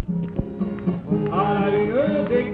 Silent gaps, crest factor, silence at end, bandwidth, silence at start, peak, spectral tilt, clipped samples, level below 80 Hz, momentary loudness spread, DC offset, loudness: none; 14 dB; 0 s; 4.7 kHz; 0 s; -8 dBFS; -10.5 dB/octave; under 0.1%; -44 dBFS; 7 LU; under 0.1%; -22 LUFS